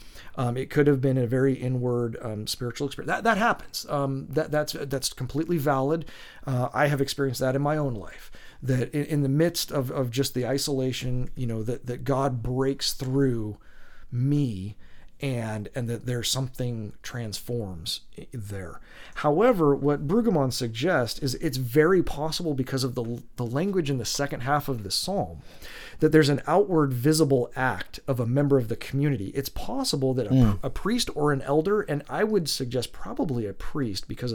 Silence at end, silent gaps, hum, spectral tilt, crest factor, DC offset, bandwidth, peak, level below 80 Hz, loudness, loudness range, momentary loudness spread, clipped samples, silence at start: 0 s; none; none; -5.5 dB/octave; 20 dB; under 0.1%; 19 kHz; -6 dBFS; -44 dBFS; -26 LUFS; 6 LU; 12 LU; under 0.1%; 0 s